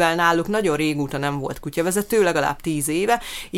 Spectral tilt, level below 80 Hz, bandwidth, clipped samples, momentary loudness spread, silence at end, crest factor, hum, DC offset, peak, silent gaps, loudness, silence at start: -4.5 dB/octave; -46 dBFS; 17 kHz; under 0.1%; 6 LU; 0 s; 18 dB; none; under 0.1%; -4 dBFS; none; -21 LUFS; 0 s